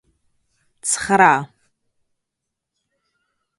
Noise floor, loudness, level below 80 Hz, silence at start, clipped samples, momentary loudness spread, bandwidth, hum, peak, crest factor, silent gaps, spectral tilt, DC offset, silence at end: -81 dBFS; -17 LUFS; -60 dBFS; 0.85 s; under 0.1%; 15 LU; 11.5 kHz; none; 0 dBFS; 24 dB; none; -3 dB/octave; under 0.1%; 2.15 s